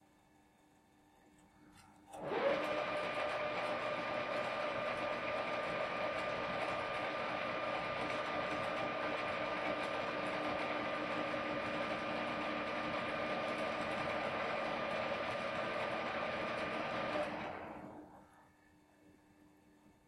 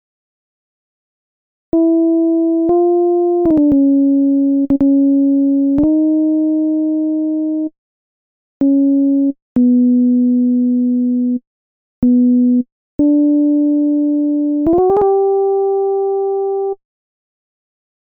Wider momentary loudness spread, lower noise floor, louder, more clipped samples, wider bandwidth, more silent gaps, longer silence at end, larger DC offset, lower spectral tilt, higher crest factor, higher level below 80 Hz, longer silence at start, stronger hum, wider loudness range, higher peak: second, 1 LU vs 6 LU; second, -69 dBFS vs under -90 dBFS; second, -39 LUFS vs -14 LUFS; neither; first, 13.5 kHz vs 1.7 kHz; second, none vs 7.78-8.60 s, 9.42-9.55 s, 11.47-12.02 s, 12.72-12.99 s; second, 0.6 s vs 1.3 s; neither; second, -5 dB/octave vs -12.5 dB/octave; first, 18 dB vs 10 dB; second, -70 dBFS vs -46 dBFS; second, 1.25 s vs 1.75 s; neither; about the same, 3 LU vs 4 LU; second, -22 dBFS vs -4 dBFS